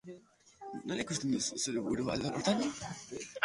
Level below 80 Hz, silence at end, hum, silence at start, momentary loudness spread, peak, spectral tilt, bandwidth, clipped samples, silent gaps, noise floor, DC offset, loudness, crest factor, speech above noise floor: -64 dBFS; 0 s; none; 0.05 s; 15 LU; -12 dBFS; -4 dB/octave; 11.5 kHz; under 0.1%; none; -58 dBFS; under 0.1%; -35 LUFS; 24 dB; 23 dB